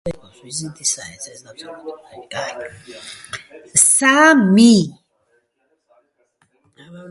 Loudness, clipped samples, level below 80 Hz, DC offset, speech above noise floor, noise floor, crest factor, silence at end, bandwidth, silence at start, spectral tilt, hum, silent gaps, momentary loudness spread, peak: -14 LUFS; under 0.1%; -56 dBFS; under 0.1%; 50 dB; -67 dBFS; 18 dB; 0.1 s; 12 kHz; 0.05 s; -3 dB/octave; none; none; 24 LU; 0 dBFS